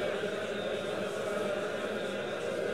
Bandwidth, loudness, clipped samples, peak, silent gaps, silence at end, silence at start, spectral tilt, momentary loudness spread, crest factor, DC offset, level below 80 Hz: 16 kHz; -34 LUFS; under 0.1%; -22 dBFS; none; 0 s; 0 s; -4.5 dB/octave; 2 LU; 12 dB; 0.2%; -70 dBFS